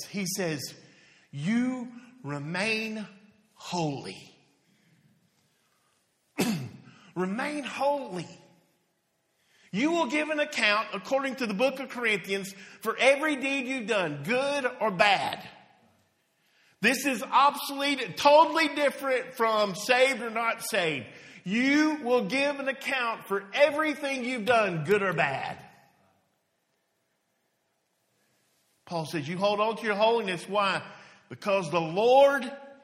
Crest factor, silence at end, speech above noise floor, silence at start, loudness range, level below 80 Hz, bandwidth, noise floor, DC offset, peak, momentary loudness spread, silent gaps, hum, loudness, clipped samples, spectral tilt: 22 dB; 0.1 s; 48 dB; 0 s; 11 LU; -76 dBFS; 16 kHz; -75 dBFS; under 0.1%; -8 dBFS; 15 LU; none; none; -27 LUFS; under 0.1%; -4 dB/octave